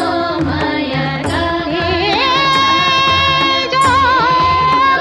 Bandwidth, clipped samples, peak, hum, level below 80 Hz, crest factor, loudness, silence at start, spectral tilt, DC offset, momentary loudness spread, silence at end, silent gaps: 12 kHz; under 0.1%; -2 dBFS; none; -36 dBFS; 12 dB; -12 LUFS; 0 s; -4 dB/octave; under 0.1%; 6 LU; 0 s; none